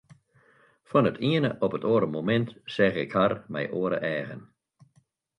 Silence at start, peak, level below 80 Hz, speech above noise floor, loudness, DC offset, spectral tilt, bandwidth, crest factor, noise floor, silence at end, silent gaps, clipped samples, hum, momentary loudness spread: 0.9 s; -8 dBFS; -64 dBFS; 41 dB; -26 LUFS; under 0.1%; -8 dB/octave; 10.5 kHz; 20 dB; -67 dBFS; 0.95 s; none; under 0.1%; none; 8 LU